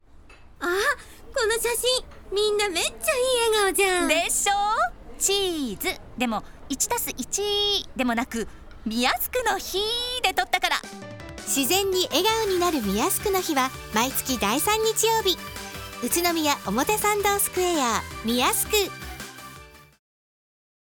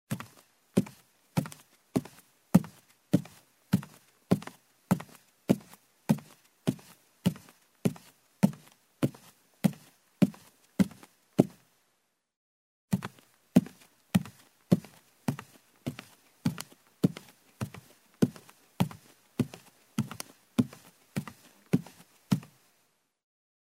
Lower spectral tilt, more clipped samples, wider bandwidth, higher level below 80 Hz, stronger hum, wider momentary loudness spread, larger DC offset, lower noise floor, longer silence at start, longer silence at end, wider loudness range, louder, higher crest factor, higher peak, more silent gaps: second, -2 dB/octave vs -7 dB/octave; neither; first, 19.5 kHz vs 16 kHz; first, -46 dBFS vs -66 dBFS; neither; second, 11 LU vs 20 LU; neither; second, -48 dBFS vs -76 dBFS; about the same, 0.15 s vs 0.1 s; second, 1.2 s vs 1.35 s; about the same, 3 LU vs 4 LU; first, -23 LUFS vs -33 LUFS; second, 20 dB vs 30 dB; about the same, -6 dBFS vs -4 dBFS; second, none vs 12.36-12.88 s